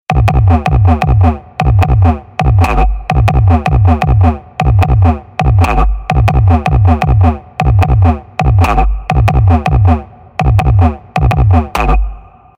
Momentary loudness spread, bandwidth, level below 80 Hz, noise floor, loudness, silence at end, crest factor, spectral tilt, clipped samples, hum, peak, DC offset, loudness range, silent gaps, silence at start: 5 LU; 9.6 kHz; -14 dBFS; -28 dBFS; -11 LUFS; 0.4 s; 10 dB; -8 dB/octave; 0.1%; none; 0 dBFS; under 0.1%; 1 LU; none; 0.1 s